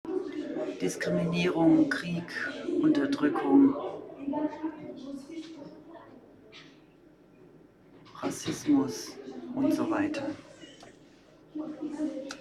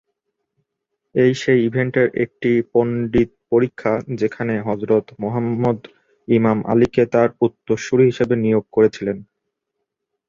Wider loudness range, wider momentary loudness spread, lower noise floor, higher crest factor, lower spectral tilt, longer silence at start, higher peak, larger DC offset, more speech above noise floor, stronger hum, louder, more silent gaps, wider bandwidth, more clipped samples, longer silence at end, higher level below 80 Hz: first, 17 LU vs 3 LU; first, 24 LU vs 7 LU; second, -57 dBFS vs -78 dBFS; about the same, 20 dB vs 16 dB; second, -6 dB/octave vs -7.5 dB/octave; second, 0.05 s vs 1.15 s; second, -10 dBFS vs -2 dBFS; neither; second, 29 dB vs 61 dB; neither; second, -29 LUFS vs -19 LUFS; neither; first, 13 kHz vs 7.6 kHz; neither; second, 0 s vs 1.05 s; second, -66 dBFS vs -50 dBFS